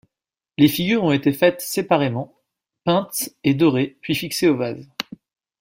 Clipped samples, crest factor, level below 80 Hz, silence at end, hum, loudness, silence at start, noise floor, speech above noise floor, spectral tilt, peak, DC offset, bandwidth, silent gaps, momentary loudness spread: under 0.1%; 18 dB; -58 dBFS; 0.6 s; none; -20 LUFS; 0.6 s; -88 dBFS; 68 dB; -5 dB/octave; -2 dBFS; under 0.1%; 16.5 kHz; none; 13 LU